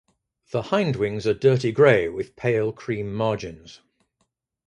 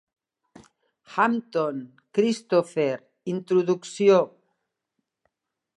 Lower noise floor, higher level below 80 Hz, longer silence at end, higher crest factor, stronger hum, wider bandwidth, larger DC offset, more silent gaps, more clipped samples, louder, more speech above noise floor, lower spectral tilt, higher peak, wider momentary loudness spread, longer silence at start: second, -74 dBFS vs -80 dBFS; first, -54 dBFS vs -78 dBFS; second, 0.95 s vs 1.5 s; about the same, 20 dB vs 20 dB; neither; about the same, 10 kHz vs 11 kHz; neither; neither; neither; about the same, -22 LUFS vs -24 LUFS; second, 52 dB vs 57 dB; about the same, -7 dB/octave vs -6 dB/octave; about the same, -4 dBFS vs -6 dBFS; about the same, 13 LU vs 13 LU; second, 0.55 s vs 1.1 s